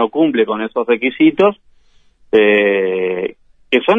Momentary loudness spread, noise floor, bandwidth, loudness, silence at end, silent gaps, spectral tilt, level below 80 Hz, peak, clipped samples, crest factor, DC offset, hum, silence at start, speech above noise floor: 8 LU; -50 dBFS; 4.2 kHz; -15 LUFS; 0 s; none; -7 dB/octave; -58 dBFS; 0 dBFS; under 0.1%; 14 dB; under 0.1%; none; 0 s; 37 dB